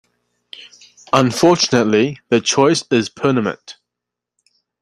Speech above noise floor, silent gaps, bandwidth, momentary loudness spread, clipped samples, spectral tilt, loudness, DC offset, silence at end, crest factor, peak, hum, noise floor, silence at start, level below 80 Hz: 68 dB; none; 13 kHz; 20 LU; under 0.1%; -4.5 dB/octave; -15 LUFS; under 0.1%; 1.1 s; 16 dB; -2 dBFS; 60 Hz at -40 dBFS; -83 dBFS; 0.6 s; -58 dBFS